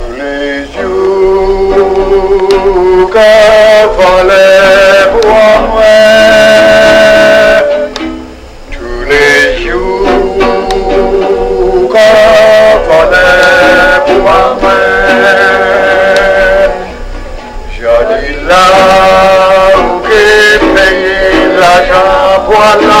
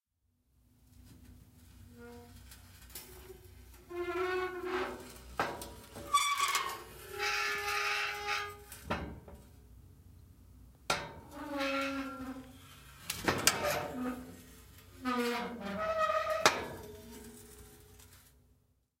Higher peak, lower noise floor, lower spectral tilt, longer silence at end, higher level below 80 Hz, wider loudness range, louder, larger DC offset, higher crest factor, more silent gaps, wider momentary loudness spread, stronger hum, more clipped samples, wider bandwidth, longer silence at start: first, 0 dBFS vs -8 dBFS; second, -26 dBFS vs -78 dBFS; first, -4 dB/octave vs -2.5 dB/octave; second, 0 s vs 0.8 s; first, -22 dBFS vs -60 dBFS; second, 5 LU vs 9 LU; first, -5 LUFS vs -34 LUFS; neither; second, 6 dB vs 30 dB; neither; second, 10 LU vs 25 LU; neither; first, 1% vs under 0.1%; about the same, 16.5 kHz vs 16 kHz; second, 0 s vs 0.95 s